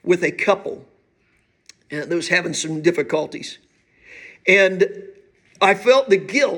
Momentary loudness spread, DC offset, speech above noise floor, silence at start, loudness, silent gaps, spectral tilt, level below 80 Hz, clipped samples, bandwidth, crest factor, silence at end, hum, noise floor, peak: 18 LU; under 0.1%; 45 dB; 0.05 s; -18 LUFS; none; -4 dB/octave; -68 dBFS; under 0.1%; 17.5 kHz; 18 dB; 0 s; none; -63 dBFS; -2 dBFS